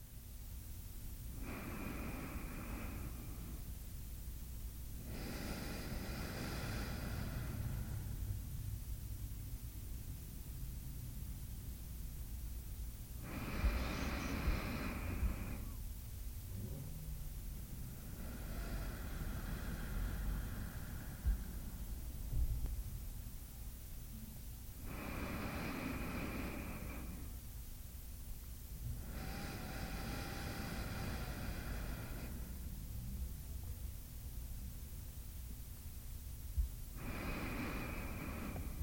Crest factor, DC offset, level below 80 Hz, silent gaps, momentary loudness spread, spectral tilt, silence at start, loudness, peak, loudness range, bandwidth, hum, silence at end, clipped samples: 20 dB; under 0.1%; -46 dBFS; none; 8 LU; -5 dB/octave; 0 s; -46 LUFS; -24 dBFS; 5 LU; 17 kHz; none; 0 s; under 0.1%